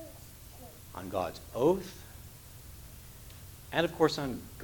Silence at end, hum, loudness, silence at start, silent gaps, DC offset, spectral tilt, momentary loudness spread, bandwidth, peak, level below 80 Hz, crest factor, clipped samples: 0 s; none; -32 LUFS; 0 s; none; under 0.1%; -5 dB/octave; 20 LU; 19 kHz; -10 dBFS; -54 dBFS; 24 dB; under 0.1%